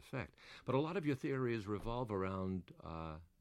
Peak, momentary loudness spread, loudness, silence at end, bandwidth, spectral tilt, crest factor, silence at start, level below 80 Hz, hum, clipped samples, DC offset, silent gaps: -22 dBFS; 12 LU; -41 LUFS; 0.15 s; 13 kHz; -8 dB/octave; 20 dB; 0 s; -60 dBFS; none; under 0.1%; under 0.1%; none